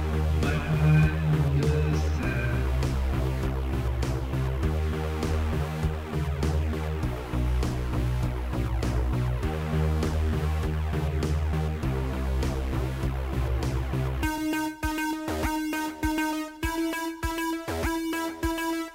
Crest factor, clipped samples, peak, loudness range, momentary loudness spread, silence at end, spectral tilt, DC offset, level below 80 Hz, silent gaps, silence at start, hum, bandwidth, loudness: 16 dB; under 0.1%; -10 dBFS; 4 LU; 5 LU; 0 s; -6.5 dB/octave; under 0.1%; -30 dBFS; none; 0 s; none; 16 kHz; -28 LUFS